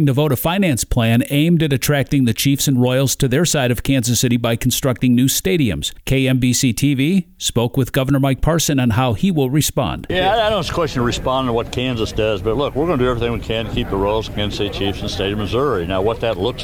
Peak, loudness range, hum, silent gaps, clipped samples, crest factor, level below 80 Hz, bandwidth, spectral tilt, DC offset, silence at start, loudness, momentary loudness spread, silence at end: -6 dBFS; 4 LU; none; none; under 0.1%; 12 dB; -32 dBFS; 20 kHz; -5 dB/octave; under 0.1%; 0 s; -17 LUFS; 5 LU; 0 s